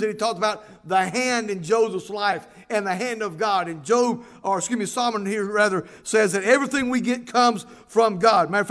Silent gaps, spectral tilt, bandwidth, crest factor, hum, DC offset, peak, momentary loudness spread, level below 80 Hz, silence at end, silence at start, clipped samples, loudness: none; -3.5 dB/octave; 11 kHz; 18 dB; none; under 0.1%; -4 dBFS; 8 LU; -64 dBFS; 0 s; 0 s; under 0.1%; -22 LUFS